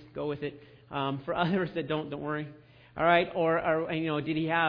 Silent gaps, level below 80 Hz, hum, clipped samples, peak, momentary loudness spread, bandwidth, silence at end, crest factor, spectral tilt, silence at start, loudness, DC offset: none; -62 dBFS; none; under 0.1%; -10 dBFS; 12 LU; 5.2 kHz; 0 s; 20 dB; -9 dB/octave; 0 s; -30 LUFS; under 0.1%